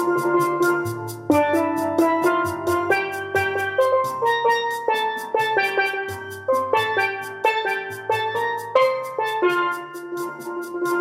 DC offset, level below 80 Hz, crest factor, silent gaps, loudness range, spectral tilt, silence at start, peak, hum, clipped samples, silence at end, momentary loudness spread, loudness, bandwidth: under 0.1%; -68 dBFS; 18 dB; none; 2 LU; -4.5 dB/octave; 0 s; -4 dBFS; none; under 0.1%; 0 s; 10 LU; -22 LUFS; 16.5 kHz